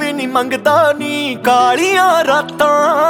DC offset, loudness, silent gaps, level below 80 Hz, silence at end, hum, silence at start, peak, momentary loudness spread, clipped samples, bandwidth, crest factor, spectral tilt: under 0.1%; -13 LUFS; none; -56 dBFS; 0 s; none; 0 s; 0 dBFS; 5 LU; under 0.1%; 18 kHz; 12 dB; -3.5 dB/octave